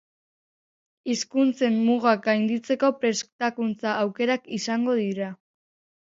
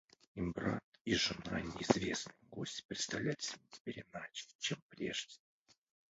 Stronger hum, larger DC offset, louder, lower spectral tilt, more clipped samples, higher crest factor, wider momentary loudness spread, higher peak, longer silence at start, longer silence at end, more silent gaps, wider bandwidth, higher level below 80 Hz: neither; neither; first, -24 LUFS vs -40 LUFS; about the same, -4.5 dB/octave vs -3.5 dB/octave; neither; second, 18 dB vs 30 dB; second, 7 LU vs 13 LU; first, -6 dBFS vs -12 dBFS; first, 1.05 s vs 0.35 s; about the same, 0.75 s vs 0.75 s; second, 3.32-3.39 s vs 0.84-0.92 s, 1.01-1.05 s, 2.85-2.89 s, 3.80-3.85 s, 4.55-4.59 s, 4.82-4.89 s; about the same, 7.8 kHz vs 8 kHz; second, -74 dBFS vs -64 dBFS